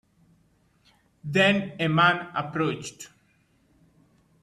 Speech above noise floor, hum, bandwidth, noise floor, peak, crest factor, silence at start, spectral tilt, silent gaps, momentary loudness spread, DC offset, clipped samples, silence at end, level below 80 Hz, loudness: 41 dB; none; 13 kHz; -65 dBFS; -8 dBFS; 20 dB; 1.25 s; -5 dB/octave; none; 21 LU; under 0.1%; under 0.1%; 1.35 s; -66 dBFS; -24 LUFS